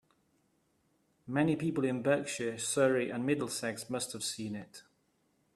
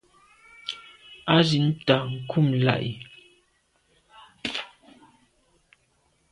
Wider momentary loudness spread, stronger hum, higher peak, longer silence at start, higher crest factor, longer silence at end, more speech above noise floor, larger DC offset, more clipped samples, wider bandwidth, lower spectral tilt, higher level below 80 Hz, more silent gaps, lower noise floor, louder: second, 9 LU vs 20 LU; neither; second, -14 dBFS vs -4 dBFS; first, 1.25 s vs 0.65 s; about the same, 20 dB vs 24 dB; second, 0.75 s vs 1.65 s; about the same, 42 dB vs 45 dB; neither; neither; first, 15 kHz vs 11 kHz; second, -4.5 dB/octave vs -6.5 dB/octave; second, -72 dBFS vs -62 dBFS; neither; first, -74 dBFS vs -68 dBFS; second, -33 LUFS vs -24 LUFS